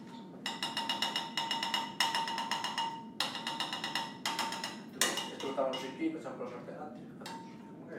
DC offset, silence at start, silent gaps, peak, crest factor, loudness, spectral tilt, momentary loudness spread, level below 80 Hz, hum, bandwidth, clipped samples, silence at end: under 0.1%; 0 s; none; -8 dBFS; 28 dB; -35 LUFS; -2 dB/octave; 14 LU; -84 dBFS; none; 17.5 kHz; under 0.1%; 0 s